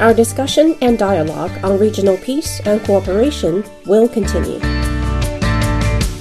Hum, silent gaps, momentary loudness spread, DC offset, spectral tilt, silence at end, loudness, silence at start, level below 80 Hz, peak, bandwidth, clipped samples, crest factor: none; none; 6 LU; under 0.1%; -5.5 dB/octave; 0 s; -15 LUFS; 0 s; -24 dBFS; 0 dBFS; 14 kHz; under 0.1%; 14 dB